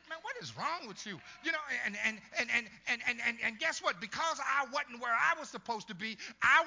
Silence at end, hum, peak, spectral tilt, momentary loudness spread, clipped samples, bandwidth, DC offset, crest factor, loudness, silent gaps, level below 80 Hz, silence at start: 0 s; none; -14 dBFS; -2 dB/octave; 10 LU; under 0.1%; 7.8 kHz; under 0.1%; 22 dB; -34 LUFS; none; -74 dBFS; 0.05 s